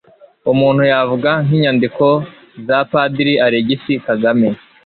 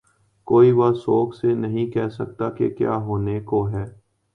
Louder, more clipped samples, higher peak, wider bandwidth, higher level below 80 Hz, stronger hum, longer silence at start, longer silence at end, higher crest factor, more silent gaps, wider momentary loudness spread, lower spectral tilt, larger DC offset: first, -14 LUFS vs -21 LUFS; neither; about the same, -2 dBFS vs -4 dBFS; about the same, 4.7 kHz vs 4.8 kHz; about the same, -54 dBFS vs -50 dBFS; neither; about the same, 0.45 s vs 0.45 s; second, 0.3 s vs 0.45 s; second, 12 dB vs 18 dB; neither; second, 6 LU vs 12 LU; about the same, -11 dB/octave vs -10 dB/octave; neither